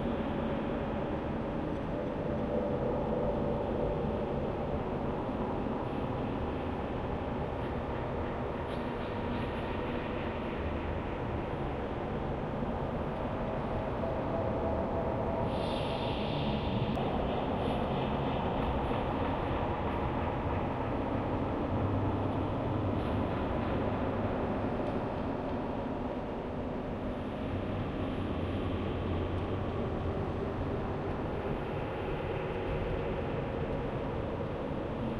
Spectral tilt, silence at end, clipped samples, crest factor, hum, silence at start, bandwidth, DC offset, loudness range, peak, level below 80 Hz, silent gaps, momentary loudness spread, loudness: -8.5 dB/octave; 0 s; under 0.1%; 14 dB; none; 0 s; 11.5 kHz; under 0.1%; 3 LU; -20 dBFS; -44 dBFS; none; 3 LU; -34 LUFS